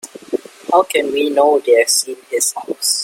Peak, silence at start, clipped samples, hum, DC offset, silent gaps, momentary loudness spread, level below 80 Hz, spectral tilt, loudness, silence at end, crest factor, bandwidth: 0 dBFS; 0.05 s; under 0.1%; none; under 0.1%; none; 13 LU; -66 dBFS; 0 dB/octave; -16 LUFS; 0 s; 16 dB; 16.5 kHz